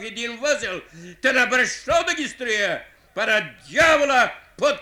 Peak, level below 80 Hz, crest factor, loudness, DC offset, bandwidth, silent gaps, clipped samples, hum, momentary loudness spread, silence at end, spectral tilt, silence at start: -4 dBFS; -52 dBFS; 18 dB; -20 LUFS; under 0.1%; 16.5 kHz; none; under 0.1%; none; 11 LU; 0 s; -2 dB/octave; 0 s